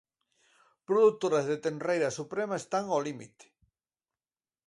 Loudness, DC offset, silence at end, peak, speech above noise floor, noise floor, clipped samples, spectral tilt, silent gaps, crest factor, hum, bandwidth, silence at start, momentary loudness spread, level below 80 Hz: -29 LUFS; under 0.1%; 1.4 s; -14 dBFS; over 61 dB; under -90 dBFS; under 0.1%; -5 dB/octave; none; 18 dB; none; 11.5 kHz; 0.9 s; 9 LU; -78 dBFS